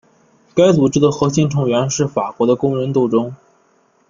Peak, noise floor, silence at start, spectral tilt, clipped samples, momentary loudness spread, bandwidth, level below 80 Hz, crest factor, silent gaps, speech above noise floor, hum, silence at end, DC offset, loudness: -2 dBFS; -57 dBFS; 0.55 s; -6 dB/octave; under 0.1%; 7 LU; 7.4 kHz; -52 dBFS; 14 dB; none; 42 dB; none; 0.75 s; under 0.1%; -16 LUFS